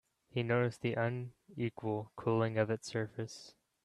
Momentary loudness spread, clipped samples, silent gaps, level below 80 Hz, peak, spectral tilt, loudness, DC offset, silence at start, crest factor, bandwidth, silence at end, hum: 11 LU; under 0.1%; none; -72 dBFS; -20 dBFS; -6.5 dB/octave; -36 LUFS; under 0.1%; 0.35 s; 18 dB; 11.5 kHz; 0.35 s; none